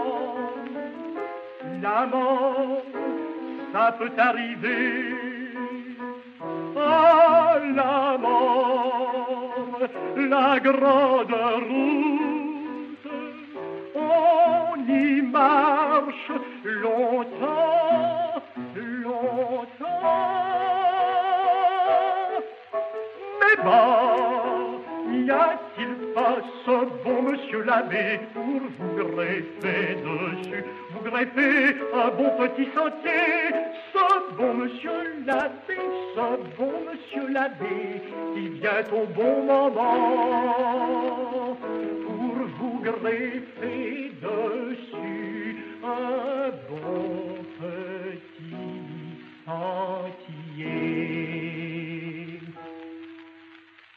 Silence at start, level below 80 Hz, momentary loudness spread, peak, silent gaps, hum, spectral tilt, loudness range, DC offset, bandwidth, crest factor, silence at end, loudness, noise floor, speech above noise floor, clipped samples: 0 s; -82 dBFS; 15 LU; -6 dBFS; none; none; -7 dB/octave; 10 LU; under 0.1%; 6 kHz; 18 dB; 0.4 s; -24 LUFS; -51 dBFS; 28 dB; under 0.1%